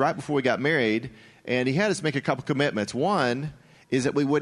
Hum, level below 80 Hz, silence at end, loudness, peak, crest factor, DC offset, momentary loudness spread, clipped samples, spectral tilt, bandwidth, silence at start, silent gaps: none; -62 dBFS; 0 s; -25 LUFS; -8 dBFS; 18 dB; under 0.1%; 7 LU; under 0.1%; -5.5 dB/octave; 11.5 kHz; 0 s; none